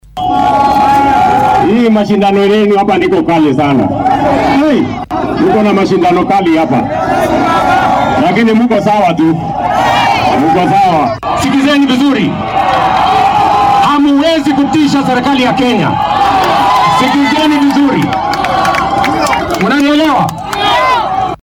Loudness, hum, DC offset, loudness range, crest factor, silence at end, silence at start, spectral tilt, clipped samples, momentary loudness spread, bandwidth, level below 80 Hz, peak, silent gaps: -9 LUFS; none; under 0.1%; 1 LU; 8 dB; 0.05 s; 0.15 s; -5.5 dB/octave; under 0.1%; 4 LU; 17.5 kHz; -36 dBFS; -2 dBFS; none